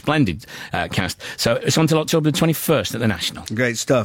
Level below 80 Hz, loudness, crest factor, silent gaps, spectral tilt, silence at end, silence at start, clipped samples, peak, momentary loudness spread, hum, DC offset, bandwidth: -48 dBFS; -20 LUFS; 14 dB; none; -4.5 dB/octave; 0 s; 0.05 s; under 0.1%; -6 dBFS; 7 LU; none; under 0.1%; 17 kHz